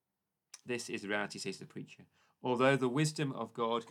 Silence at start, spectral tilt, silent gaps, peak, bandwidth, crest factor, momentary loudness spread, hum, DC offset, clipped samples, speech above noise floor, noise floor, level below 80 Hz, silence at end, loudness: 0.55 s; -5 dB/octave; none; -14 dBFS; 14.5 kHz; 22 dB; 19 LU; none; under 0.1%; under 0.1%; 53 dB; -88 dBFS; -88 dBFS; 0 s; -35 LUFS